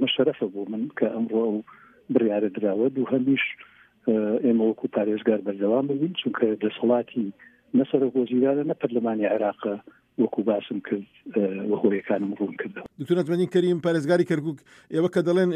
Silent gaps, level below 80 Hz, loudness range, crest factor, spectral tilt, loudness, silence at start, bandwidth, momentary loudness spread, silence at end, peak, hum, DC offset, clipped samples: none; -74 dBFS; 2 LU; 18 dB; -7.5 dB/octave; -25 LUFS; 0 s; 10.5 kHz; 9 LU; 0 s; -6 dBFS; none; under 0.1%; under 0.1%